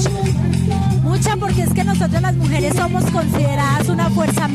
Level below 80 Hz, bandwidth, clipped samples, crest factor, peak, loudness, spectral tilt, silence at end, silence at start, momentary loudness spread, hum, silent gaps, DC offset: -34 dBFS; 14.5 kHz; under 0.1%; 12 dB; -4 dBFS; -17 LUFS; -6 dB/octave; 0 s; 0 s; 1 LU; none; none; under 0.1%